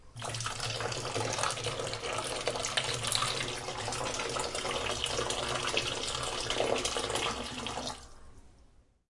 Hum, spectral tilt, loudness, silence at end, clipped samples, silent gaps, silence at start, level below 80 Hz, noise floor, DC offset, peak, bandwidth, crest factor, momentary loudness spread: none; -2 dB/octave; -33 LUFS; 0.5 s; under 0.1%; none; 0 s; -52 dBFS; -61 dBFS; under 0.1%; -12 dBFS; 11.5 kHz; 24 dB; 6 LU